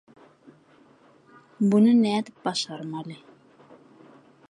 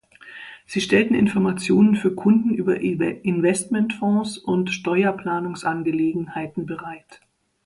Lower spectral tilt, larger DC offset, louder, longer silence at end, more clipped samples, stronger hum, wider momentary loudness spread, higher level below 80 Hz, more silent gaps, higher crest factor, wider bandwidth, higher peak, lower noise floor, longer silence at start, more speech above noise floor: about the same, -6 dB/octave vs -6 dB/octave; neither; about the same, -23 LUFS vs -21 LUFS; first, 1.35 s vs 0.5 s; neither; neither; first, 19 LU vs 14 LU; second, -76 dBFS vs -58 dBFS; neither; about the same, 18 dB vs 18 dB; about the same, 11 kHz vs 11.5 kHz; second, -10 dBFS vs -4 dBFS; first, -57 dBFS vs -42 dBFS; first, 1.6 s vs 0.25 s; first, 34 dB vs 21 dB